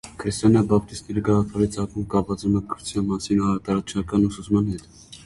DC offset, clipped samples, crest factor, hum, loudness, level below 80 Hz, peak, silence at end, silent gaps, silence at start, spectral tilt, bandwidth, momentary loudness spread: under 0.1%; under 0.1%; 18 dB; none; -23 LUFS; -44 dBFS; -4 dBFS; 0.05 s; none; 0.05 s; -7 dB/octave; 11.5 kHz; 9 LU